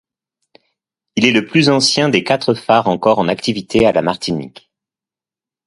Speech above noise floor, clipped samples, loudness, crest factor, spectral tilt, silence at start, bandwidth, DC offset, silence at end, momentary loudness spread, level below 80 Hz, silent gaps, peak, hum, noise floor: 75 dB; under 0.1%; -14 LUFS; 16 dB; -4.5 dB/octave; 1.15 s; 11.5 kHz; under 0.1%; 1.2 s; 9 LU; -50 dBFS; none; 0 dBFS; none; -90 dBFS